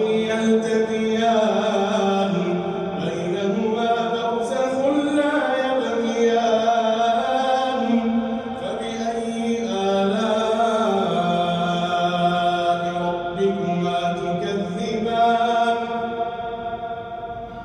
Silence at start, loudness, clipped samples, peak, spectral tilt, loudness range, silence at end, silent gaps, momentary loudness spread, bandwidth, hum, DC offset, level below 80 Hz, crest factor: 0 s; -21 LUFS; under 0.1%; -8 dBFS; -5.5 dB/octave; 2 LU; 0 s; none; 7 LU; 10.5 kHz; none; under 0.1%; -56 dBFS; 12 dB